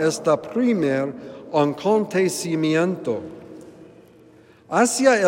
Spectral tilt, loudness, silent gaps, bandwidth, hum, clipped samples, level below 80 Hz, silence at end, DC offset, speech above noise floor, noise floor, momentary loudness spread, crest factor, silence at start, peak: -4.5 dB/octave; -21 LUFS; none; 16 kHz; none; under 0.1%; -68 dBFS; 0 s; under 0.1%; 30 dB; -50 dBFS; 18 LU; 18 dB; 0 s; -4 dBFS